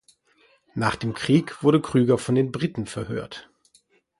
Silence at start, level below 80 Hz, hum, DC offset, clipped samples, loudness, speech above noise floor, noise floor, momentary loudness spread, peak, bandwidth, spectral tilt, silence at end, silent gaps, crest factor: 0.75 s; -56 dBFS; none; under 0.1%; under 0.1%; -23 LUFS; 40 dB; -62 dBFS; 13 LU; -6 dBFS; 11.5 kHz; -6.5 dB/octave; 0.8 s; none; 18 dB